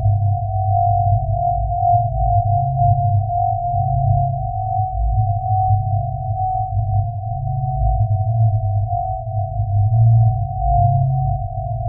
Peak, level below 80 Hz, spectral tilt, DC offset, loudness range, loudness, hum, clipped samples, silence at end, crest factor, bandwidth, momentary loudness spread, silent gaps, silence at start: -4 dBFS; -28 dBFS; -3.5 dB/octave; under 0.1%; 3 LU; -18 LUFS; none; under 0.1%; 0 s; 14 dB; 0.9 kHz; 6 LU; none; 0 s